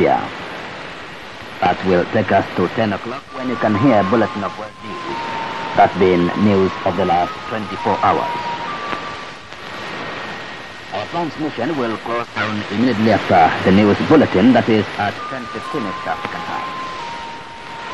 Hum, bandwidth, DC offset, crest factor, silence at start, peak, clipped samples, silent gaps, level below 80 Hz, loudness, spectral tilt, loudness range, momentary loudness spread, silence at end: none; 11.5 kHz; 0.6%; 16 dB; 0 s; -2 dBFS; under 0.1%; none; -50 dBFS; -18 LUFS; -6.5 dB/octave; 9 LU; 16 LU; 0 s